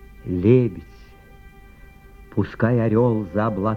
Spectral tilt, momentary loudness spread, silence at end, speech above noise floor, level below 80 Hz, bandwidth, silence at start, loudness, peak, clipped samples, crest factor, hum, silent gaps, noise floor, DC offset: -10.5 dB/octave; 11 LU; 0 s; 26 dB; -46 dBFS; 5 kHz; 0.2 s; -21 LUFS; -2 dBFS; under 0.1%; 18 dB; none; none; -45 dBFS; under 0.1%